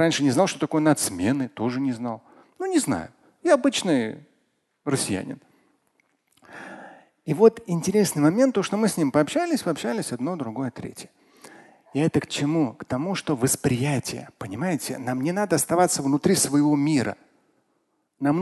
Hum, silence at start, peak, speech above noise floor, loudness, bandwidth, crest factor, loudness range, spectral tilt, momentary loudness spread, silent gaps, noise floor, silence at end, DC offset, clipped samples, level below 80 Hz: none; 0 s; -4 dBFS; 48 dB; -23 LUFS; 12.5 kHz; 20 dB; 6 LU; -5 dB/octave; 16 LU; none; -71 dBFS; 0 s; under 0.1%; under 0.1%; -58 dBFS